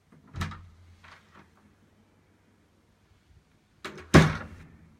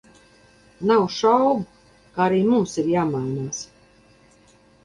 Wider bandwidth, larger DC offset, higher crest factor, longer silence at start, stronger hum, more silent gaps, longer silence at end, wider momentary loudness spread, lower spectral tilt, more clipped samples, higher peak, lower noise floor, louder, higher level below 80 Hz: first, 15 kHz vs 11.5 kHz; neither; first, 30 dB vs 18 dB; second, 0.35 s vs 0.8 s; neither; neither; second, 0.55 s vs 1.2 s; first, 26 LU vs 15 LU; about the same, -6 dB/octave vs -6 dB/octave; neither; first, -2 dBFS vs -6 dBFS; first, -64 dBFS vs -55 dBFS; second, -24 LUFS vs -21 LUFS; first, -46 dBFS vs -58 dBFS